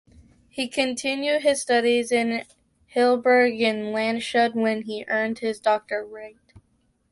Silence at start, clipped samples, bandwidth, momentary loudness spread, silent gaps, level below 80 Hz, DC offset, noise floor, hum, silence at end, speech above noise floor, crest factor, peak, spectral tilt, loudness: 0.55 s; under 0.1%; 11.5 kHz; 12 LU; none; -64 dBFS; under 0.1%; -67 dBFS; none; 0.5 s; 44 dB; 16 dB; -8 dBFS; -3.5 dB/octave; -23 LUFS